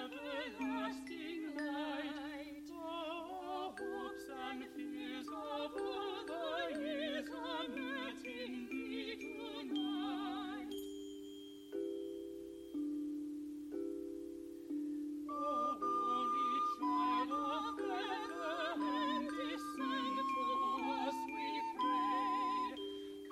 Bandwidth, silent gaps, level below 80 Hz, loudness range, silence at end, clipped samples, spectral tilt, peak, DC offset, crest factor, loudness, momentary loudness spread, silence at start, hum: 15.5 kHz; none; -74 dBFS; 7 LU; 0 s; under 0.1%; -3.5 dB/octave; -26 dBFS; under 0.1%; 14 dB; -41 LUFS; 10 LU; 0 s; none